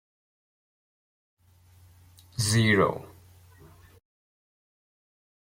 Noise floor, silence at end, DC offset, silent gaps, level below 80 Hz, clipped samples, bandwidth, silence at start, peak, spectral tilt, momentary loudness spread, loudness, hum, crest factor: -57 dBFS; 2.5 s; under 0.1%; none; -62 dBFS; under 0.1%; 16.5 kHz; 2.4 s; -10 dBFS; -4.5 dB/octave; 19 LU; -24 LUFS; none; 22 dB